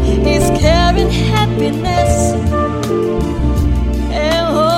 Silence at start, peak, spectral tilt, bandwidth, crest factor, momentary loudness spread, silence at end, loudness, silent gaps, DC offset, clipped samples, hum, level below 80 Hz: 0 s; 0 dBFS; -6 dB/octave; 16 kHz; 12 dB; 5 LU; 0 s; -14 LUFS; none; under 0.1%; under 0.1%; none; -20 dBFS